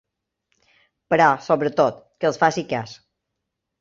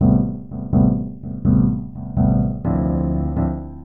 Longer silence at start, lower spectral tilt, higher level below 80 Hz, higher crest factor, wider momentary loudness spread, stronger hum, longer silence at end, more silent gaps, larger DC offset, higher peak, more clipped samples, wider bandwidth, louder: first, 1.1 s vs 0 s; second, -5.5 dB/octave vs -14.5 dB/octave; second, -64 dBFS vs -30 dBFS; first, 20 dB vs 12 dB; about the same, 11 LU vs 9 LU; neither; first, 0.85 s vs 0 s; neither; second, under 0.1% vs 0.8%; first, -2 dBFS vs -6 dBFS; neither; first, 7.6 kHz vs 2.1 kHz; about the same, -20 LUFS vs -20 LUFS